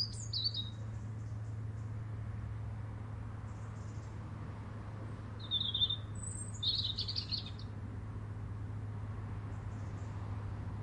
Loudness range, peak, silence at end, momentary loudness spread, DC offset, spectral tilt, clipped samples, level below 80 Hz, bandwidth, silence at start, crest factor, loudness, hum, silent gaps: 8 LU; -22 dBFS; 0 s; 12 LU; under 0.1%; -4 dB/octave; under 0.1%; -54 dBFS; 9.6 kHz; 0 s; 20 dB; -40 LUFS; none; none